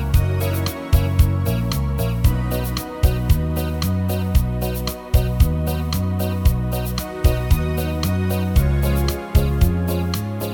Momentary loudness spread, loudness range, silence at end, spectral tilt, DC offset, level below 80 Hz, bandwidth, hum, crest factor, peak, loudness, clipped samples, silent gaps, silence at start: 5 LU; 1 LU; 0 s; -6.5 dB/octave; under 0.1%; -22 dBFS; 19 kHz; none; 16 dB; -2 dBFS; -21 LUFS; under 0.1%; none; 0 s